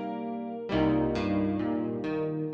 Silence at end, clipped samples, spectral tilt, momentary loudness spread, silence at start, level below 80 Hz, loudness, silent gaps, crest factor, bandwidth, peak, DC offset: 0 s; under 0.1%; -8.5 dB/octave; 8 LU; 0 s; -50 dBFS; -30 LUFS; none; 16 dB; 7 kHz; -14 dBFS; under 0.1%